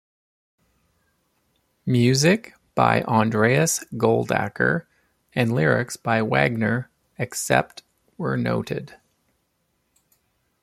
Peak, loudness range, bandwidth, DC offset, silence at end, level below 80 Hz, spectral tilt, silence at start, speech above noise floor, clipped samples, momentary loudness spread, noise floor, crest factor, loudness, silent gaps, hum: -2 dBFS; 7 LU; 15 kHz; under 0.1%; 1.75 s; -58 dBFS; -5 dB/octave; 1.85 s; 50 dB; under 0.1%; 12 LU; -71 dBFS; 22 dB; -22 LUFS; none; none